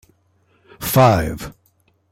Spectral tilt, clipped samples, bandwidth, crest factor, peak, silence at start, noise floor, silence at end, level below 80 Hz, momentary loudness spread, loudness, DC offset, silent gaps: -6 dB/octave; under 0.1%; 16.5 kHz; 18 dB; -2 dBFS; 0.8 s; -61 dBFS; 0.6 s; -40 dBFS; 19 LU; -16 LUFS; under 0.1%; none